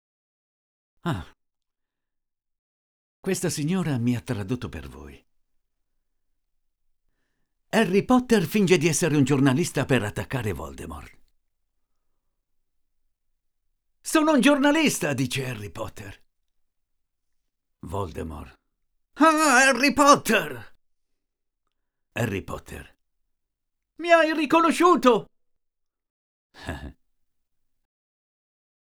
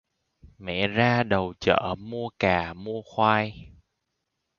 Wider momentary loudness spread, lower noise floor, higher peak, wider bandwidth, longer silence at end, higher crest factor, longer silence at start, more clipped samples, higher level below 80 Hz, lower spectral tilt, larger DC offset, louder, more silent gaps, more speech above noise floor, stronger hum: first, 20 LU vs 11 LU; about the same, -81 dBFS vs -80 dBFS; about the same, -2 dBFS vs -4 dBFS; first, over 20 kHz vs 7.2 kHz; first, 2.1 s vs 0.9 s; about the same, 24 dB vs 22 dB; first, 1.05 s vs 0.6 s; neither; about the same, -52 dBFS vs -50 dBFS; second, -4.5 dB/octave vs -6.5 dB/octave; neither; first, -22 LUFS vs -25 LUFS; first, 2.59-3.23 s, 26.10-26.50 s vs none; first, 59 dB vs 55 dB; neither